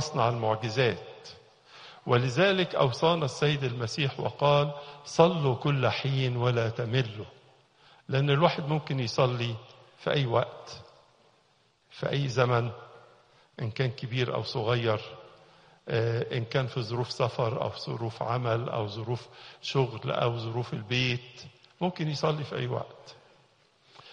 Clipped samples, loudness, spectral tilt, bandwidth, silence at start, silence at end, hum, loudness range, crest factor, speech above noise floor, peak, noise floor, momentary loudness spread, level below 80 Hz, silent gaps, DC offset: under 0.1%; -29 LUFS; -6 dB/octave; 9.8 kHz; 0 s; 0 s; none; 6 LU; 24 dB; 39 dB; -6 dBFS; -67 dBFS; 16 LU; -64 dBFS; none; under 0.1%